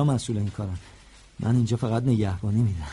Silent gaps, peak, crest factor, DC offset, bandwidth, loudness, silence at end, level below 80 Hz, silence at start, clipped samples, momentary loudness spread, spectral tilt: none; -12 dBFS; 12 dB; under 0.1%; 11.5 kHz; -26 LUFS; 0 s; -46 dBFS; 0 s; under 0.1%; 10 LU; -7.5 dB/octave